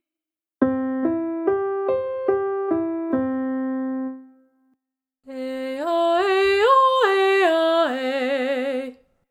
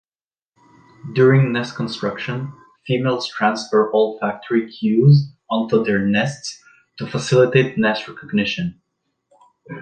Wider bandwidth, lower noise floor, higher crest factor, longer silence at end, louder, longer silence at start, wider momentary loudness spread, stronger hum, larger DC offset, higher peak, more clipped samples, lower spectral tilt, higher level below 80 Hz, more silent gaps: first, 14.5 kHz vs 9.2 kHz; about the same, -90 dBFS vs under -90 dBFS; about the same, 18 dB vs 18 dB; first, 0.35 s vs 0 s; about the same, -21 LUFS vs -19 LUFS; second, 0.6 s vs 1.05 s; second, 12 LU vs 15 LU; neither; neither; about the same, -4 dBFS vs -2 dBFS; neither; second, -4.5 dB/octave vs -6.5 dB/octave; about the same, -62 dBFS vs -58 dBFS; neither